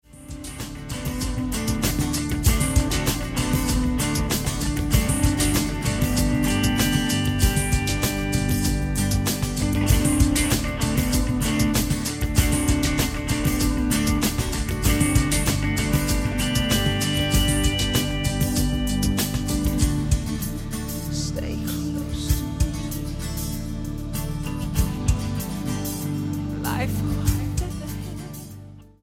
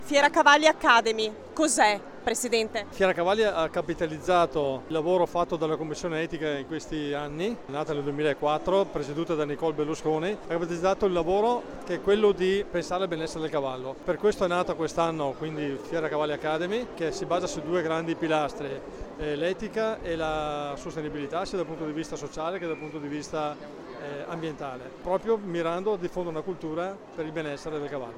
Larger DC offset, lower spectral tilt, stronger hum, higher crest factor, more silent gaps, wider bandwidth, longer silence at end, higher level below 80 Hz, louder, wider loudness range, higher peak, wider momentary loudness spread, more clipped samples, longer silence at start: neither; about the same, -4.5 dB/octave vs -4 dB/octave; neither; about the same, 18 dB vs 22 dB; neither; about the same, 16.5 kHz vs 16.5 kHz; first, 0.2 s vs 0 s; first, -28 dBFS vs -52 dBFS; first, -23 LUFS vs -28 LUFS; about the same, 6 LU vs 7 LU; about the same, -4 dBFS vs -6 dBFS; about the same, 9 LU vs 11 LU; neither; first, 0.15 s vs 0 s